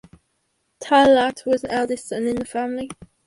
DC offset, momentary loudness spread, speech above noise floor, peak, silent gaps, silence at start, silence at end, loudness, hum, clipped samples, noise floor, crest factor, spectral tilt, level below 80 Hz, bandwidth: under 0.1%; 15 LU; 51 dB; -2 dBFS; none; 0.8 s; 0.35 s; -20 LUFS; none; under 0.1%; -70 dBFS; 18 dB; -4 dB/octave; -54 dBFS; 11.5 kHz